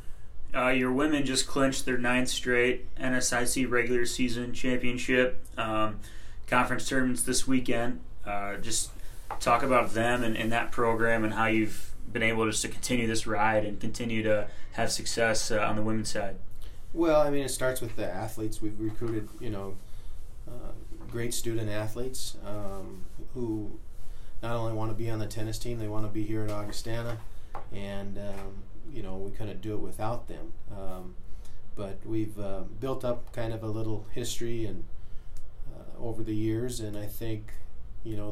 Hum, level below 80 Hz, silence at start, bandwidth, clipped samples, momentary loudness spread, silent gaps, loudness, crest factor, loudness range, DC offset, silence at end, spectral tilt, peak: none; -40 dBFS; 0 s; 15 kHz; under 0.1%; 20 LU; none; -30 LUFS; 20 dB; 11 LU; under 0.1%; 0 s; -4 dB/octave; -8 dBFS